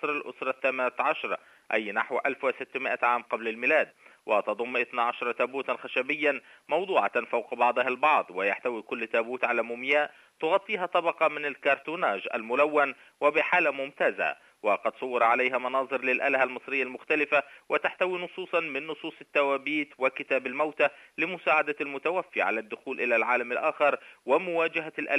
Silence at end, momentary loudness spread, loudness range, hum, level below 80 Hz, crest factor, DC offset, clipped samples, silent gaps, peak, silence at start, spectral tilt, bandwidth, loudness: 0 s; 7 LU; 2 LU; none; -84 dBFS; 18 dB; under 0.1%; under 0.1%; none; -10 dBFS; 0 s; -5 dB/octave; 11 kHz; -27 LUFS